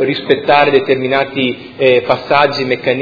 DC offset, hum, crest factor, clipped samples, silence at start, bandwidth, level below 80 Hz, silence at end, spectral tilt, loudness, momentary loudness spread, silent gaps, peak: under 0.1%; none; 12 dB; 0.2%; 0 s; 5.4 kHz; -52 dBFS; 0 s; -6.5 dB/octave; -13 LUFS; 6 LU; none; 0 dBFS